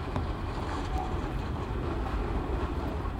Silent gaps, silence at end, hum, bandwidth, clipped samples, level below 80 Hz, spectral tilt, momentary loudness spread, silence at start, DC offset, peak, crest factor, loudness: none; 0 s; none; 11 kHz; under 0.1%; -36 dBFS; -7.5 dB/octave; 2 LU; 0 s; under 0.1%; -16 dBFS; 14 dB; -34 LUFS